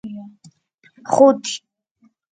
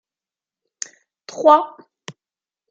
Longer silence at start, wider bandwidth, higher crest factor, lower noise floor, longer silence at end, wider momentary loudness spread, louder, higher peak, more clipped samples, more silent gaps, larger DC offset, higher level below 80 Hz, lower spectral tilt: second, 0.05 s vs 1.35 s; about the same, 9.4 kHz vs 9 kHz; about the same, 20 dB vs 20 dB; second, -60 dBFS vs under -90 dBFS; first, 0.75 s vs 0.6 s; second, 23 LU vs 26 LU; about the same, -16 LUFS vs -15 LUFS; about the same, 0 dBFS vs -2 dBFS; neither; first, 0.74-0.78 s vs none; neither; first, -70 dBFS vs -82 dBFS; about the same, -4.5 dB/octave vs -3.5 dB/octave